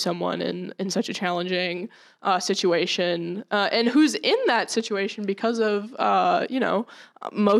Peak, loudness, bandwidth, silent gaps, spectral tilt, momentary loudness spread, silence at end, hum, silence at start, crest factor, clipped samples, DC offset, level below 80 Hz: -6 dBFS; -24 LUFS; 14 kHz; none; -4 dB/octave; 10 LU; 0 s; none; 0 s; 18 dB; under 0.1%; under 0.1%; -80 dBFS